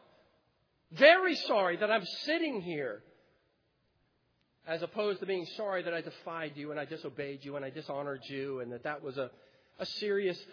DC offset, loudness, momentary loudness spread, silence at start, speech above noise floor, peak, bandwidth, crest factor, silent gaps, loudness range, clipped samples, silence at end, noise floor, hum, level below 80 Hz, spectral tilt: under 0.1%; -33 LUFS; 14 LU; 0.9 s; 42 dB; -8 dBFS; 5.4 kHz; 26 dB; none; 10 LU; under 0.1%; 0 s; -75 dBFS; none; -82 dBFS; -2 dB/octave